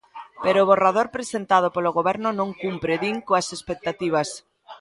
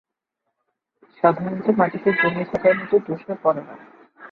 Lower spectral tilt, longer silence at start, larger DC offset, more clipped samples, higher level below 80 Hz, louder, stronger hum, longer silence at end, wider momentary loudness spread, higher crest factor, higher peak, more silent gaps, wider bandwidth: second, -4.5 dB/octave vs -9 dB/octave; second, 0.15 s vs 1.25 s; neither; neither; about the same, -60 dBFS vs -62 dBFS; about the same, -22 LUFS vs -21 LUFS; neither; about the same, 0.05 s vs 0.05 s; first, 12 LU vs 6 LU; about the same, 20 dB vs 20 dB; about the same, -2 dBFS vs -2 dBFS; neither; first, 11.5 kHz vs 5.2 kHz